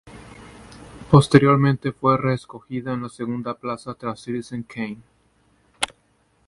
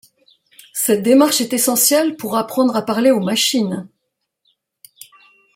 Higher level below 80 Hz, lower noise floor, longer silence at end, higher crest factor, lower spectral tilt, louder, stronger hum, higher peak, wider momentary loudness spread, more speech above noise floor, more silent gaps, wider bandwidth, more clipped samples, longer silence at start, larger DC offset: first, -52 dBFS vs -66 dBFS; second, -63 dBFS vs -75 dBFS; second, 0.6 s vs 1.7 s; first, 22 dB vs 16 dB; first, -6.5 dB/octave vs -3 dB/octave; second, -22 LUFS vs -15 LUFS; neither; about the same, 0 dBFS vs -2 dBFS; first, 19 LU vs 9 LU; second, 42 dB vs 59 dB; neither; second, 11.5 kHz vs 16.5 kHz; neither; second, 0.05 s vs 0.75 s; neither